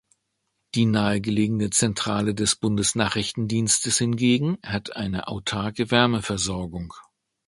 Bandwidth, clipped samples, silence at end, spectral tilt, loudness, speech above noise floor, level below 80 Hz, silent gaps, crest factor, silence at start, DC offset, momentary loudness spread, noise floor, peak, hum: 11.5 kHz; under 0.1%; 0.45 s; -4 dB/octave; -23 LUFS; 53 dB; -48 dBFS; none; 24 dB; 0.75 s; under 0.1%; 9 LU; -76 dBFS; 0 dBFS; none